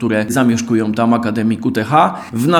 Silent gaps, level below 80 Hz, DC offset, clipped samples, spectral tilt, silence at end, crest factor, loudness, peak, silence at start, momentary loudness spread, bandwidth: none; -54 dBFS; under 0.1%; under 0.1%; -6 dB/octave; 0 s; 14 dB; -15 LUFS; 0 dBFS; 0 s; 4 LU; 17.5 kHz